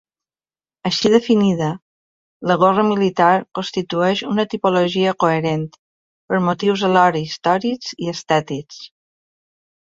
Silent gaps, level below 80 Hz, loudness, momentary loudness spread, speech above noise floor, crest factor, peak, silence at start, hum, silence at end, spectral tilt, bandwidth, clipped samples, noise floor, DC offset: 1.82-2.40 s, 5.79-6.28 s; -60 dBFS; -18 LUFS; 12 LU; over 73 dB; 18 dB; -2 dBFS; 0.85 s; none; 1 s; -5.5 dB/octave; 7.8 kHz; under 0.1%; under -90 dBFS; under 0.1%